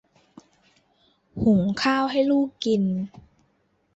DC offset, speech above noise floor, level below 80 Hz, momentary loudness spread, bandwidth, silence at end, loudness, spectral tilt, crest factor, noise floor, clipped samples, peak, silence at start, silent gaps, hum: under 0.1%; 45 dB; -54 dBFS; 10 LU; 8.2 kHz; 0.9 s; -23 LUFS; -6.5 dB/octave; 16 dB; -67 dBFS; under 0.1%; -10 dBFS; 1.35 s; none; none